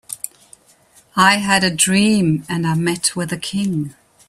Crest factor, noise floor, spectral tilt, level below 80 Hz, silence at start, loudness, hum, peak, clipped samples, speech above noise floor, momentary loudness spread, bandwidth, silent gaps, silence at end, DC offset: 18 dB; -52 dBFS; -3.5 dB/octave; -54 dBFS; 0.1 s; -16 LUFS; none; 0 dBFS; under 0.1%; 35 dB; 14 LU; 15 kHz; none; 0.4 s; under 0.1%